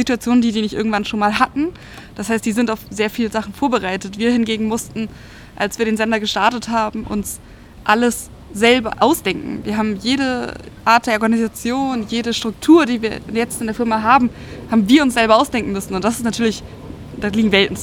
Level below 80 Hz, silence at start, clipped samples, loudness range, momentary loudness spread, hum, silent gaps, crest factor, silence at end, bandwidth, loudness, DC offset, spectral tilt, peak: -44 dBFS; 0 s; under 0.1%; 4 LU; 11 LU; none; none; 18 dB; 0 s; 17 kHz; -17 LUFS; under 0.1%; -4.5 dB/octave; 0 dBFS